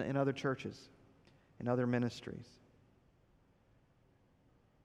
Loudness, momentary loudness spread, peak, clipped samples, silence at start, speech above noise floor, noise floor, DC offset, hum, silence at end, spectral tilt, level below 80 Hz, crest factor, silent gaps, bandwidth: -38 LUFS; 16 LU; -20 dBFS; under 0.1%; 0 s; 33 dB; -70 dBFS; under 0.1%; none; 2.4 s; -7 dB/octave; -72 dBFS; 20 dB; none; 11 kHz